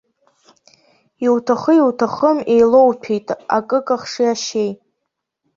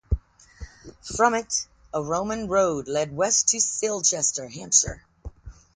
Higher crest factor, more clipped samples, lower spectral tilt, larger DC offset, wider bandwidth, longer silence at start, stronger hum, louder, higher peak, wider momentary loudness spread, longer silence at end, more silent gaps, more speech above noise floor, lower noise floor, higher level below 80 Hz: second, 16 dB vs 22 dB; neither; first, -5 dB/octave vs -2.5 dB/octave; neither; second, 7.6 kHz vs 10.5 kHz; first, 1.2 s vs 0.1 s; neither; first, -16 LUFS vs -23 LUFS; about the same, -2 dBFS vs -4 dBFS; second, 10 LU vs 22 LU; first, 0.8 s vs 0.25 s; neither; first, 61 dB vs 19 dB; first, -77 dBFS vs -44 dBFS; second, -62 dBFS vs -40 dBFS